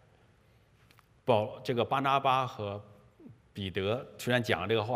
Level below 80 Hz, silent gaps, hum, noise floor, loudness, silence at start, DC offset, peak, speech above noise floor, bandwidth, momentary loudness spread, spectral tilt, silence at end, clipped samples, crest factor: -68 dBFS; none; none; -64 dBFS; -31 LUFS; 1.25 s; under 0.1%; -10 dBFS; 34 dB; 15.5 kHz; 12 LU; -5.5 dB/octave; 0 s; under 0.1%; 22 dB